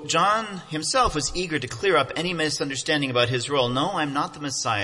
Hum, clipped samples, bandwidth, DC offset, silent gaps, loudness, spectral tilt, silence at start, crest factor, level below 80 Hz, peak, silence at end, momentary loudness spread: none; under 0.1%; 11.5 kHz; under 0.1%; none; -23 LUFS; -3.5 dB/octave; 0 s; 18 dB; -46 dBFS; -6 dBFS; 0 s; 6 LU